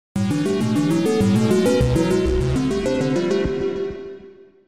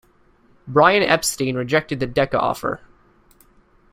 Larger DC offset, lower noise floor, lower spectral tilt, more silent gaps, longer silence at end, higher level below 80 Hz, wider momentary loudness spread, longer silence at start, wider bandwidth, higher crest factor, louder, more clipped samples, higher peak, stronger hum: first, 0.6% vs under 0.1%; second, -44 dBFS vs -56 dBFS; first, -6.5 dB/octave vs -4 dB/octave; neither; second, 0.25 s vs 1.15 s; first, -34 dBFS vs -50 dBFS; second, 8 LU vs 11 LU; second, 0.15 s vs 0.65 s; about the same, 15.5 kHz vs 16 kHz; second, 14 dB vs 20 dB; about the same, -20 LUFS vs -19 LUFS; neither; second, -6 dBFS vs 0 dBFS; neither